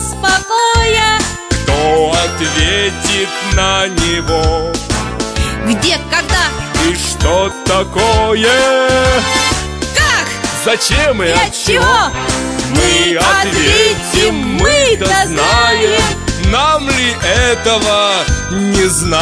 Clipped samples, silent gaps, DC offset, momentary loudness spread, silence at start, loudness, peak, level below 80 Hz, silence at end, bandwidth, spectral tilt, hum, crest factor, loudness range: under 0.1%; none; under 0.1%; 6 LU; 0 s; -11 LUFS; 0 dBFS; -24 dBFS; 0 s; 11 kHz; -3 dB/octave; none; 12 dB; 3 LU